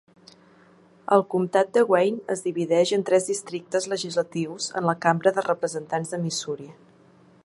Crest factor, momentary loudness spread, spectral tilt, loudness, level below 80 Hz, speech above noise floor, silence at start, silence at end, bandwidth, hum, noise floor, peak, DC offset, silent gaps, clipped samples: 22 dB; 8 LU; -4.5 dB/octave; -24 LUFS; -72 dBFS; 31 dB; 1.1 s; 0.7 s; 11.5 kHz; none; -55 dBFS; -4 dBFS; under 0.1%; none; under 0.1%